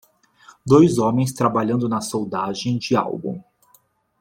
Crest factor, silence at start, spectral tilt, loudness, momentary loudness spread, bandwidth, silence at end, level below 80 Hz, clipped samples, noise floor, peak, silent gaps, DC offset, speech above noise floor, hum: 18 dB; 0.65 s; -6.5 dB/octave; -20 LUFS; 15 LU; 16.5 kHz; 0.8 s; -56 dBFS; under 0.1%; -59 dBFS; -2 dBFS; none; under 0.1%; 40 dB; none